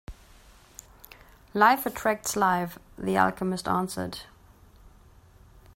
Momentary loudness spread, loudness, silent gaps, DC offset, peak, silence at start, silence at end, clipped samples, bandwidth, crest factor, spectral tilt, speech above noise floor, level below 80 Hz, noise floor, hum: 24 LU; -26 LUFS; none; under 0.1%; -6 dBFS; 0.1 s; 0.85 s; under 0.1%; 16.5 kHz; 24 dB; -4.5 dB/octave; 28 dB; -54 dBFS; -54 dBFS; none